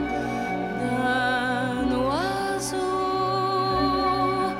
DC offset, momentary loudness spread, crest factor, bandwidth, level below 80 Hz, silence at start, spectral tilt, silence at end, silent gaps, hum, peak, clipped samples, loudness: under 0.1%; 5 LU; 12 dB; 16 kHz; -46 dBFS; 0 s; -5 dB/octave; 0 s; none; none; -12 dBFS; under 0.1%; -25 LUFS